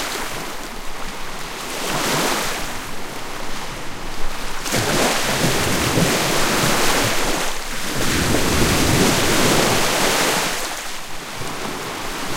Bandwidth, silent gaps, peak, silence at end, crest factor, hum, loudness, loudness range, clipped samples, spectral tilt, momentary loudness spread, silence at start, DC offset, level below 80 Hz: 17 kHz; none; -2 dBFS; 0 s; 16 dB; none; -20 LUFS; 7 LU; under 0.1%; -3 dB/octave; 14 LU; 0 s; under 0.1%; -30 dBFS